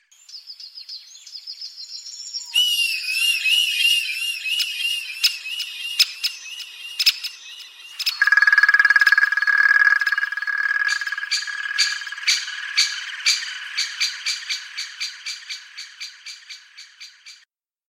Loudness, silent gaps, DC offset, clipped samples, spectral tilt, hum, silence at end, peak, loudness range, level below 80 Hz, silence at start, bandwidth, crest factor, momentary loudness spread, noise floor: -19 LUFS; none; under 0.1%; under 0.1%; 7.5 dB/octave; none; 0.55 s; -2 dBFS; 11 LU; -84 dBFS; 0.3 s; 16 kHz; 20 dB; 22 LU; -60 dBFS